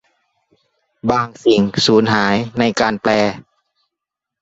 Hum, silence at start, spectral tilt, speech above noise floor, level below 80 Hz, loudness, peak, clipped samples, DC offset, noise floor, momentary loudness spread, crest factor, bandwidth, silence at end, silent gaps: none; 1.05 s; -5 dB/octave; 67 dB; -50 dBFS; -16 LUFS; -2 dBFS; under 0.1%; under 0.1%; -82 dBFS; 6 LU; 16 dB; 8 kHz; 1 s; none